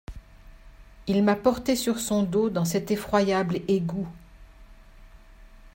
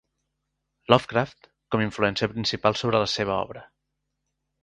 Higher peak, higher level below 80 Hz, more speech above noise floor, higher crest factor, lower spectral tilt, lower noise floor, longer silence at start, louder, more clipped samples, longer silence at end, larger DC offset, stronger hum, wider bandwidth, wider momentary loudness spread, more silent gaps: second, -8 dBFS vs 0 dBFS; first, -48 dBFS vs -56 dBFS; second, 25 dB vs 55 dB; second, 18 dB vs 26 dB; about the same, -5.5 dB/octave vs -5 dB/octave; second, -49 dBFS vs -80 dBFS; second, 0.1 s vs 0.9 s; about the same, -25 LUFS vs -24 LUFS; neither; second, 0.05 s vs 1 s; neither; neither; first, 16.5 kHz vs 11 kHz; second, 10 LU vs 13 LU; neither